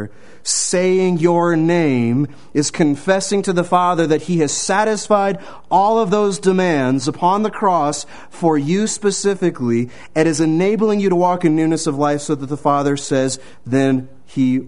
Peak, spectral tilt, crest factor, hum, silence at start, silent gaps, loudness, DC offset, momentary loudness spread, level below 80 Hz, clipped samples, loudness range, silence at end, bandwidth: 0 dBFS; -5 dB/octave; 16 dB; none; 0 s; none; -17 LUFS; 1%; 6 LU; -54 dBFS; under 0.1%; 2 LU; 0 s; 11 kHz